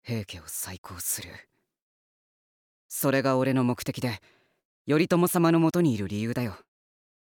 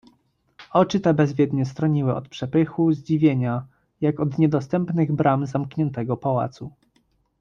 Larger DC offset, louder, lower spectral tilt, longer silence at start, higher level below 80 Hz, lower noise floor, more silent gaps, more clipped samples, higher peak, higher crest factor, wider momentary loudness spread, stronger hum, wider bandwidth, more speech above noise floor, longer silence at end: neither; second, -27 LUFS vs -22 LUFS; second, -5.5 dB/octave vs -8.5 dB/octave; second, 0.05 s vs 0.6 s; second, -66 dBFS vs -58 dBFS; first, under -90 dBFS vs -66 dBFS; first, 0.78-0.84 s, 1.81-2.89 s, 4.65-4.85 s vs none; neither; second, -10 dBFS vs -4 dBFS; about the same, 18 dB vs 18 dB; first, 14 LU vs 7 LU; neither; first, 19.5 kHz vs 7.2 kHz; first, over 64 dB vs 44 dB; about the same, 0.65 s vs 0.7 s